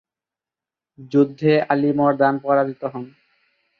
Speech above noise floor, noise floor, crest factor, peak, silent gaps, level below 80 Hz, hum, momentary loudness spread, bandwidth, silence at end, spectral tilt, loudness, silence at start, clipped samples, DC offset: 70 dB; -89 dBFS; 18 dB; -2 dBFS; none; -68 dBFS; none; 13 LU; 6.2 kHz; 0.7 s; -9 dB/octave; -19 LUFS; 1 s; under 0.1%; under 0.1%